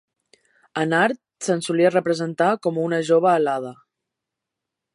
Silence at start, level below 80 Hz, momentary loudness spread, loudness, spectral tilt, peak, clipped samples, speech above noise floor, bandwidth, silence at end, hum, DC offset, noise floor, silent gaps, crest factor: 0.75 s; -74 dBFS; 10 LU; -21 LUFS; -5.5 dB/octave; -6 dBFS; under 0.1%; 64 dB; 11.5 kHz; 1.2 s; none; under 0.1%; -84 dBFS; none; 18 dB